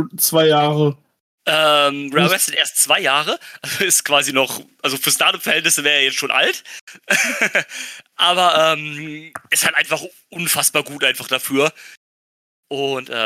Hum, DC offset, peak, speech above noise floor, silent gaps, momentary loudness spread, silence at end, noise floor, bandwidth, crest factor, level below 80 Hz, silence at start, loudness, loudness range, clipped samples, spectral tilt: none; under 0.1%; 0 dBFS; over 72 dB; 1.20-1.38 s, 6.81-6.87 s, 11.97-12.63 s; 14 LU; 0 s; under -90 dBFS; 16.5 kHz; 18 dB; -72 dBFS; 0 s; -16 LUFS; 3 LU; under 0.1%; -2 dB/octave